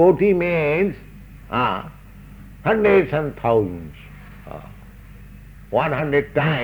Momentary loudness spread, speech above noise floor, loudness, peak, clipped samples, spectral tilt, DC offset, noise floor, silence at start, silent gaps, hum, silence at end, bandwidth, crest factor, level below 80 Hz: 22 LU; 23 dB; -20 LUFS; -4 dBFS; under 0.1%; -8.5 dB/octave; under 0.1%; -41 dBFS; 0 s; none; none; 0 s; over 20 kHz; 18 dB; -44 dBFS